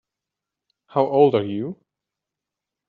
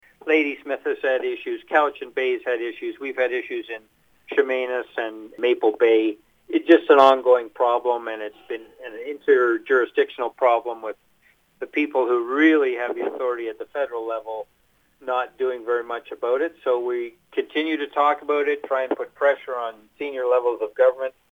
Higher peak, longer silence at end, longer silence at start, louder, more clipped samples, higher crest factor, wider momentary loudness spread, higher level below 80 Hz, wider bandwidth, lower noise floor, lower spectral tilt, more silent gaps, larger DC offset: about the same, -4 dBFS vs -2 dBFS; first, 1.15 s vs 0.2 s; first, 0.95 s vs 0.25 s; about the same, -20 LUFS vs -22 LUFS; neither; about the same, 20 dB vs 20 dB; about the same, 13 LU vs 14 LU; about the same, -72 dBFS vs -72 dBFS; second, 4.6 kHz vs 7.2 kHz; first, -86 dBFS vs -61 dBFS; first, -6.5 dB/octave vs -4.5 dB/octave; neither; neither